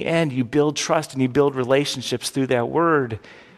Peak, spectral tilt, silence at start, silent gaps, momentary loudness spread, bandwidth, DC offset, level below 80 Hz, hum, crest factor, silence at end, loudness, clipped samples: -4 dBFS; -5 dB/octave; 0 s; none; 6 LU; 14 kHz; under 0.1%; -56 dBFS; none; 16 dB; 0.2 s; -21 LUFS; under 0.1%